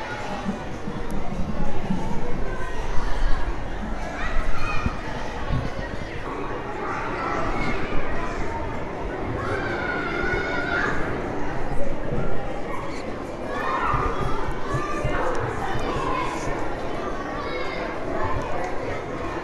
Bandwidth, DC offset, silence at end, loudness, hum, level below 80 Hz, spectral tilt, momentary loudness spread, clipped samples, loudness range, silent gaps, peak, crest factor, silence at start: 10.5 kHz; under 0.1%; 0 s; -28 LUFS; none; -32 dBFS; -6 dB/octave; 7 LU; under 0.1%; 3 LU; none; -6 dBFS; 16 dB; 0 s